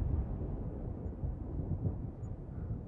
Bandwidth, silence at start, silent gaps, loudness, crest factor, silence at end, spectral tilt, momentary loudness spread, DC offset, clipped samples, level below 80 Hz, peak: 2.7 kHz; 0 s; none; -40 LUFS; 16 dB; 0 s; -12 dB/octave; 6 LU; under 0.1%; under 0.1%; -42 dBFS; -22 dBFS